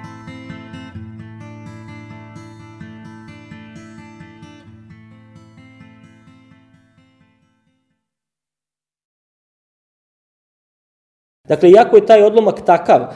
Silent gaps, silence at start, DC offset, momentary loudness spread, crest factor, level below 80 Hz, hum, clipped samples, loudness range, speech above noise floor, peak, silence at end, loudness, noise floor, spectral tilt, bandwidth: 9.05-11.44 s; 0 s; under 0.1%; 29 LU; 18 dB; -60 dBFS; none; under 0.1%; 27 LU; over 80 dB; 0 dBFS; 0 s; -10 LUFS; under -90 dBFS; -7 dB/octave; 10.5 kHz